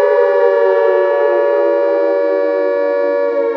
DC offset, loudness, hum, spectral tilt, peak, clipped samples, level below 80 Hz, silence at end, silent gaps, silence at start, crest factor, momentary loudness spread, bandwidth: under 0.1%; -13 LUFS; none; -4.5 dB/octave; -2 dBFS; under 0.1%; -76 dBFS; 0 s; none; 0 s; 10 dB; 3 LU; 6 kHz